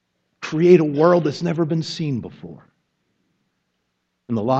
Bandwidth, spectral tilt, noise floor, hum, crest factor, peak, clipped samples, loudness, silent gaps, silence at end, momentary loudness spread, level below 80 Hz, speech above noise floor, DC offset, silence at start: 7.8 kHz; -7.5 dB/octave; -73 dBFS; none; 20 dB; 0 dBFS; under 0.1%; -19 LUFS; none; 0 s; 21 LU; -64 dBFS; 55 dB; under 0.1%; 0.4 s